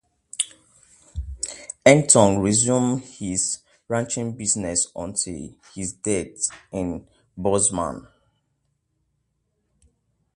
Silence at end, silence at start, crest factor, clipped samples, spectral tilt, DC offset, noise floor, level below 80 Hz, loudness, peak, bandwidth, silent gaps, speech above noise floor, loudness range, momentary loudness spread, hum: 2.35 s; 0.4 s; 24 dB; under 0.1%; -4 dB/octave; under 0.1%; -73 dBFS; -46 dBFS; -22 LUFS; 0 dBFS; 11.5 kHz; none; 51 dB; 8 LU; 18 LU; none